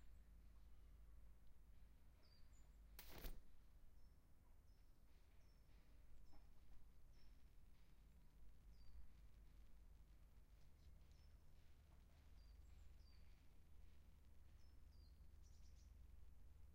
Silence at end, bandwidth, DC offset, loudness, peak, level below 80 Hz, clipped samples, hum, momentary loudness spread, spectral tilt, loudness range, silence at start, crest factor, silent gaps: 0 s; 15 kHz; under 0.1%; -66 LUFS; -40 dBFS; -66 dBFS; under 0.1%; none; 9 LU; -5 dB/octave; 2 LU; 0 s; 22 dB; none